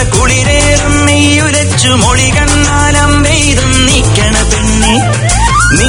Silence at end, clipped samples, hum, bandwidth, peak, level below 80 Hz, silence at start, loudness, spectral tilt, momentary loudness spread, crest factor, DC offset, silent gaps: 0 s; 0.9%; none; 14 kHz; 0 dBFS; -16 dBFS; 0 s; -7 LUFS; -3.5 dB/octave; 2 LU; 8 dB; under 0.1%; none